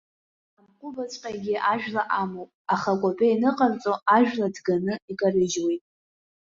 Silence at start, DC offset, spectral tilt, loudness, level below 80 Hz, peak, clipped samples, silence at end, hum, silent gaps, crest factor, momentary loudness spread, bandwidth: 0.85 s; under 0.1%; -5 dB/octave; -25 LUFS; -66 dBFS; -6 dBFS; under 0.1%; 0.7 s; none; 2.54-2.65 s, 5.02-5.08 s; 18 dB; 13 LU; 7.8 kHz